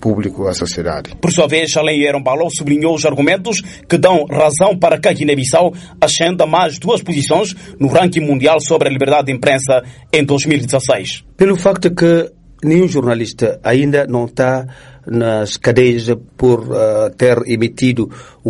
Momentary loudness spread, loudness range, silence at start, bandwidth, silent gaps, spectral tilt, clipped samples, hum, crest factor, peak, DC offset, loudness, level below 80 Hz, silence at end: 7 LU; 2 LU; 0 s; 11.5 kHz; none; -5 dB/octave; under 0.1%; none; 14 dB; 0 dBFS; under 0.1%; -14 LUFS; -44 dBFS; 0 s